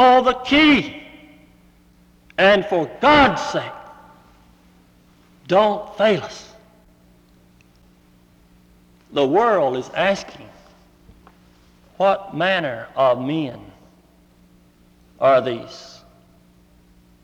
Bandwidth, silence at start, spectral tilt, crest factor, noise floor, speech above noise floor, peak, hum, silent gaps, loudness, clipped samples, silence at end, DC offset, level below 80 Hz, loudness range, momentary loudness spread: 11 kHz; 0 s; -5 dB/octave; 18 dB; -53 dBFS; 35 dB; -2 dBFS; none; none; -18 LUFS; under 0.1%; 1.35 s; under 0.1%; -50 dBFS; 6 LU; 20 LU